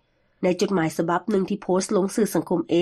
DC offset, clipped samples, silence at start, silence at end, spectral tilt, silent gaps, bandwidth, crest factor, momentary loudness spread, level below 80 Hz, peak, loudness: under 0.1%; under 0.1%; 0.4 s; 0 s; -5.5 dB/octave; none; 13 kHz; 14 dB; 3 LU; -62 dBFS; -10 dBFS; -23 LUFS